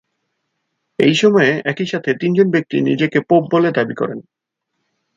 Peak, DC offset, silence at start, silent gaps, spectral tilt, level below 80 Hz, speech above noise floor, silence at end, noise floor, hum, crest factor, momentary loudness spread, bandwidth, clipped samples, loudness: 0 dBFS; under 0.1%; 1 s; none; -6 dB/octave; -62 dBFS; 58 dB; 0.95 s; -74 dBFS; none; 16 dB; 10 LU; 7.8 kHz; under 0.1%; -16 LUFS